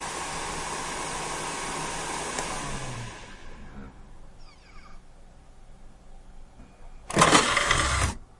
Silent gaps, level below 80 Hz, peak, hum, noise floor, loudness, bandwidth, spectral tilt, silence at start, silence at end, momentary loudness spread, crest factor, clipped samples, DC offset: none; -42 dBFS; -2 dBFS; none; -48 dBFS; -26 LUFS; 11.5 kHz; -2.5 dB/octave; 0 s; 0.15 s; 26 LU; 28 dB; under 0.1%; under 0.1%